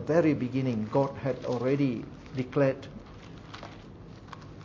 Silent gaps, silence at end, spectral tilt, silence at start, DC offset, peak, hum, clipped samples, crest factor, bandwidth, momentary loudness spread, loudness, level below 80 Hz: none; 0 s; -8 dB/octave; 0 s; under 0.1%; -10 dBFS; none; under 0.1%; 20 dB; 7.4 kHz; 20 LU; -29 LUFS; -56 dBFS